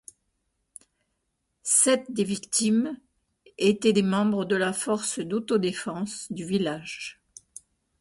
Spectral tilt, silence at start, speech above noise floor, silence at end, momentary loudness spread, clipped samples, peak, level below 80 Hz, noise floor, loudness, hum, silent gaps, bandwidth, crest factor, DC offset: -3.5 dB/octave; 1.65 s; 52 dB; 0.9 s; 15 LU; under 0.1%; -8 dBFS; -66 dBFS; -78 dBFS; -25 LUFS; none; none; 12 kHz; 20 dB; under 0.1%